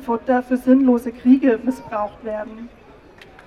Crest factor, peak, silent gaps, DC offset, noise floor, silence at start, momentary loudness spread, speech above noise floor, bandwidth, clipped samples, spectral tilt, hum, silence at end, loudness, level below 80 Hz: 16 dB; -2 dBFS; none; under 0.1%; -45 dBFS; 0 s; 14 LU; 27 dB; 12.5 kHz; under 0.1%; -7 dB/octave; none; 0.8 s; -19 LUFS; -52 dBFS